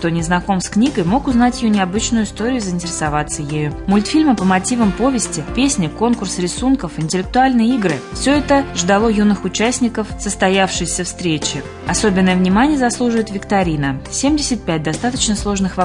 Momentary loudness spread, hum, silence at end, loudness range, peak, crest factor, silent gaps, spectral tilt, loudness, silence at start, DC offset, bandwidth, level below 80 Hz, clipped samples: 6 LU; none; 0 s; 1 LU; -2 dBFS; 14 dB; none; -4.5 dB/octave; -16 LUFS; 0 s; under 0.1%; 11 kHz; -34 dBFS; under 0.1%